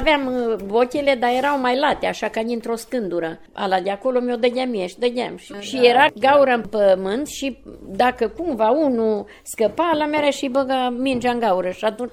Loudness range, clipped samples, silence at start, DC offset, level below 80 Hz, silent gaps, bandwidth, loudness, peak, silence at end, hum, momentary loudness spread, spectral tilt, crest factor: 4 LU; under 0.1%; 0 s; under 0.1%; -46 dBFS; none; 16 kHz; -20 LUFS; 0 dBFS; 0 s; none; 11 LU; -4 dB/octave; 18 dB